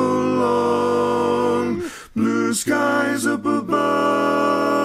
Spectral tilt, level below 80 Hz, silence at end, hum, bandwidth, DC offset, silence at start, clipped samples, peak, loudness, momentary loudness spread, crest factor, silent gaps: -4.5 dB/octave; -58 dBFS; 0 s; none; 16 kHz; under 0.1%; 0 s; under 0.1%; -6 dBFS; -19 LUFS; 4 LU; 14 dB; none